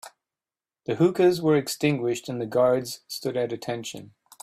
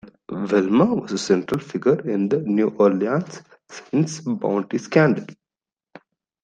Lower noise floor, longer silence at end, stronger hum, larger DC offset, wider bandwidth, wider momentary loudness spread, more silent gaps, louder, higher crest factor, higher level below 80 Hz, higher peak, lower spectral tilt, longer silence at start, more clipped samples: about the same, under -90 dBFS vs under -90 dBFS; second, 0.4 s vs 1.1 s; neither; neither; first, 15.5 kHz vs 10 kHz; second, 13 LU vs 16 LU; neither; second, -25 LUFS vs -21 LUFS; about the same, 18 dB vs 20 dB; about the same, -66 dBFS vs -62 dBFS; second, -8 dBFS vs -2 dBFS; about the same, -5.5 dB/octave vs -6.5 dB/octave; about the same, 0.05 s vs 0.05 s; neither